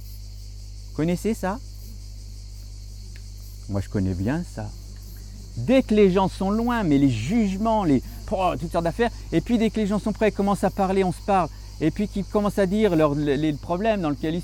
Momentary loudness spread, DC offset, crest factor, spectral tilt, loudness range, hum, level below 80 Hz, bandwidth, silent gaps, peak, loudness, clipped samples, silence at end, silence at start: 20 LU; under 0.1%; 16 dB; -7 dB/octave; 10 LU; 50 Hz at -35 dBFS; -38 dBFS; 17 kHz; none; -8 dBFS; -23 LUFS; under 0.1%; 0 s; 0 s